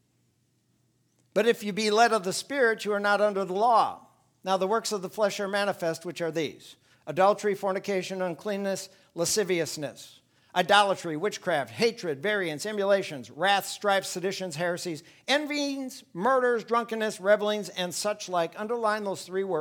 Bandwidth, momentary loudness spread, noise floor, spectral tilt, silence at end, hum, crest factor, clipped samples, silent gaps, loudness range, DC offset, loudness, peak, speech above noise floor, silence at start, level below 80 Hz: 19.5 kHz; 9 LU; -70 dBFS; -3.5 dB/octave; 0 s; none; 22 dB; under 0.1%; none; 4 LU; under 0.1%; -27 LUFS; -6 dBFS; 43 dB; 1.35 s; -78 dBFS